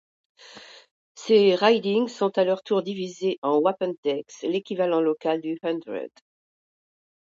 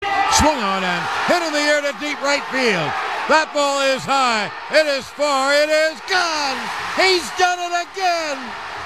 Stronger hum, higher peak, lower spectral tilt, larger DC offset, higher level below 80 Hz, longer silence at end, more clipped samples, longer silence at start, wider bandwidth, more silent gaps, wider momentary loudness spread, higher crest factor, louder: neither; second, -6 dBFS vs -2 dBFS; first, -5.5 dB/octave vs -2.5 dB/octave; second, under 0.1% vs 0.3%; second, -76 dBFS vs -44 dBFS; first, 1.3 s vs 0 s; neither; first, 0.5 s vs 0 s; second, 7.6 kHz vs 14.5 kHz; first, 0.91-1.15 s, 3.38-3.42 s, 3.98-4.03 s vs none; first, 16 LU vs 7 LU; about the same, 20 dB vs 18 dB; second, -24 LUFS vs -18 LUFS